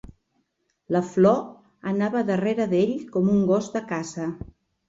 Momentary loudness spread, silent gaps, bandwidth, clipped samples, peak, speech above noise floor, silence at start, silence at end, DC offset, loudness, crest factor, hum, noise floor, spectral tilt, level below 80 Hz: 14 LU; none; 7.8 kHz; under 0.1%; -8 dBFS; 50 dB; 0.9 s; 0.5 s; under 0.1%; -24 LUFS; 18 dB; none; -73 dBFS; -7.5 dB/octave; -56 dBFS